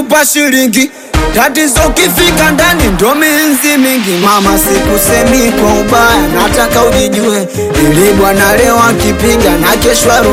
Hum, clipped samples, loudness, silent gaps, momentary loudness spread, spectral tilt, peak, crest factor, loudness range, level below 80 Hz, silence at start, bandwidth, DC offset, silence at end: none; 0.5%; -7 LUFS; none; 3 LU; -3.5 dB/octave; 0 dBFS; 8 dB; 1 LU; -22 dBFS; 0 s; 17.5 kHz; under 0.1%; 0 s